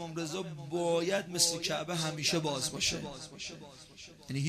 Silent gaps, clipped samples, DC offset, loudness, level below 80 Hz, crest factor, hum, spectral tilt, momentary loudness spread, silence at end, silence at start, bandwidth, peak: none; under 0.1%; under 0.1%; -32 LUFS; -62 dBFS; 22 dB; none; -3 dB/octave; 21 LU; 0 s; 0 s; 15.5 kHz; -14 dBFS